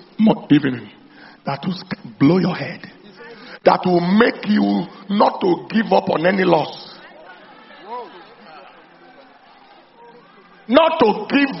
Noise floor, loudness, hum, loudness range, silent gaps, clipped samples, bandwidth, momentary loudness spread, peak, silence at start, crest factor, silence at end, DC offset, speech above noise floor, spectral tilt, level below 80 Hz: -47 dBFS; -17 LUFS; none; 22 LU; none; under 0.1%; 6 kHz; 20 LU; 0 dBFS; 0.2 s; 20 dB; 0 s; under 0.1%; 31 dB; -5 dB/octave; -58 dBFS